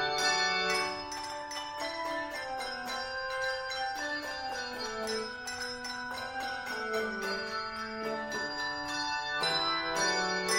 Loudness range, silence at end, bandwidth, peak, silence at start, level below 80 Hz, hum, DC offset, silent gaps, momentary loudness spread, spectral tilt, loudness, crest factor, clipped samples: 4 LU; 0 s; 16 kHz; -16 dBFS; 0 s; -62 dBFS; none; under 0.1%; none; 9 LU; -1.5 dB/octave; -33 LUFS; 18 dB; under 0.1%